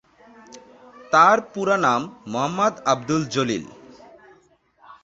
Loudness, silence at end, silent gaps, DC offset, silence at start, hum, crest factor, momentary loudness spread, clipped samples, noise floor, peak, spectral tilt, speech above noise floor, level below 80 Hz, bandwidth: -20 LUFS; 0.1 s; none; under 0.1%; 0.55 s; none; 22 dB; 12 LU; under 0.1%; -58 dBFS; -2 dBFS; -4.5 dB/octave; 38 dB; -62 dBFS; 8 kHz